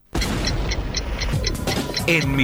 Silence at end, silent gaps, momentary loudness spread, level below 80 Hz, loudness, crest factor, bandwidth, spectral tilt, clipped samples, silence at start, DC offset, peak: 0 s; none; 6 LU; -28 dBFS; -23 LUFS; 16 dB; over 20 kHz; -4.5 dB/octave; under 0.1%; 0.15 s; under 0.1%; -6 dBFS